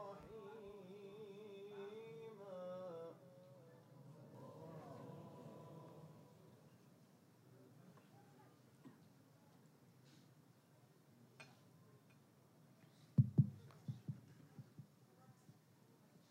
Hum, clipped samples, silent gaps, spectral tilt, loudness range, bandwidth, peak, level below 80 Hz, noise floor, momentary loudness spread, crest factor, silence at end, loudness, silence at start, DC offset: none; under 0.1%; none; -9 dB/octave; 22 LU; 15.5 kHz; -22 dBFS; -86 dBFS; -70 dBFS; 18 LU; 30 dB; 0 s; -48 LUFS; 0 s; under 0.1%